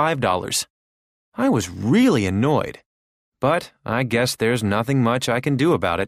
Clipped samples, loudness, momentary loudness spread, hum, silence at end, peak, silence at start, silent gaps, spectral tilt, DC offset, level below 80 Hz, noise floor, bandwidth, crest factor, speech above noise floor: under 0.1%; -20 LUFS; 7 LU; none; 0 s; -6 dBFS; 0 s; 0.70-1.32 s, 2.86-3.32 s; -5.5 dB/octave; under 0.1%; -52 dBFS; under -90 dBFS; 15.5 kHz; 16 dB; over 70 dB